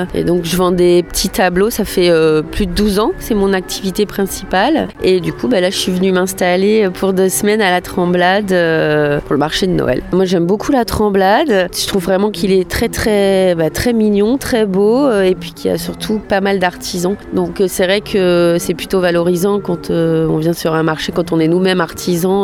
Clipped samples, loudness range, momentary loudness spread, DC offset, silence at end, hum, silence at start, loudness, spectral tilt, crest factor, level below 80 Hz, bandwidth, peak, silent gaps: under 0.1%; 2 LU; 5 LU; under 0.1%; 0 s; none; 0 s; -14 LUFS; -5 dB/octave; 12 dB; -34 dBFS; 19 kHz; 0 dBFS; none